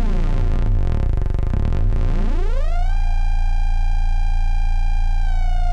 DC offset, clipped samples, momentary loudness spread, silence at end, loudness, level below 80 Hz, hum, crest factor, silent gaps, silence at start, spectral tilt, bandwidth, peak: under 0.1%; under 0.1%; 2 LU; 0 s; -23 LUFS; -16 dBFS; none; 6 dB; none; 0 s; -7.5 dB/octave; 5 kHz; -8 dBFS